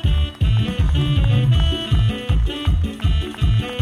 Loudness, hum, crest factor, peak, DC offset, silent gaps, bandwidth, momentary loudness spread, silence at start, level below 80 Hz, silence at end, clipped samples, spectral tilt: -19 LUFS; none; 10 dB; -6 dBFS; under 0.1%; none; 10.5 kHz; 4 LU; 0 s; -20 dBFS; 0 s; under 0.1%; -7 dB/octave